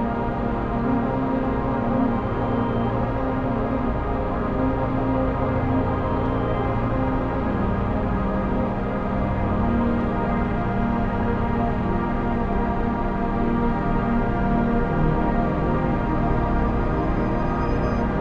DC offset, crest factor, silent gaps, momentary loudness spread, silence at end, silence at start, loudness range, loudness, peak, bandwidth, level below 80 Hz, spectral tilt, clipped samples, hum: under 0.1%; 12 dB; none; 2 LU; 0 s; 0 s; 1 LU; -23 LUFS; -8 dBFS; 6.6 kHz; -28 dBFS; -10 dB/octave; under 0.1%; none